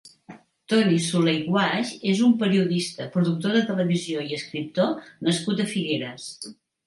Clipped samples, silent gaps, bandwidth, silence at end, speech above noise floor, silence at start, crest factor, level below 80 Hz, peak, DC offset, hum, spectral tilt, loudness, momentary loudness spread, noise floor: under 0.1%; none; 11.5 kHz; 0.35 s; 25 dB; 0.05 s; 16 dB; -70 dBFS; -8 dBFS; under 0.1%; none; -5.5 dB/octave; -23 LUFS; 10 LU; -48 dBFS